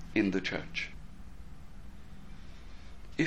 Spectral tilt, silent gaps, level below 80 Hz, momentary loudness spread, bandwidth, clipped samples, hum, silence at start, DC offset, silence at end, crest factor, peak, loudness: -5.5 dB/octave; none; -50 dBFS; 22 LU; 11.5 kHz; under 0.1%; none; 0 s; 0.5%; 0 s; 22 dB; -14 dBFS; -34 LUFS